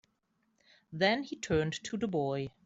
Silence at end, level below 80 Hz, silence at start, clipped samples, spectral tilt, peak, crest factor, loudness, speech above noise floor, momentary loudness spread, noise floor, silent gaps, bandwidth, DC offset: 0.15 s; -60 dBFS; 0.9 s; under 0.1%; -5 dB/octave; -14 dBFS; 20 dB; -33 LUFS; 44 dB; 6 LU; -77 dBFS; none; 8 kHz; under 0.1%